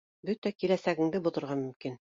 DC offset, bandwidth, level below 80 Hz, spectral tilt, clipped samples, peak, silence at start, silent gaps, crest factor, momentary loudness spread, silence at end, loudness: under 0.1%; 7.6 kHz; -72 dBFS; -7 dB/octave; under 0.1%; -14 dBFS; 0.25 s; 0.38-0.42 s, 1.76-1.80 s; 18 dB; 9 LU; 0.2 s; -32 LUFS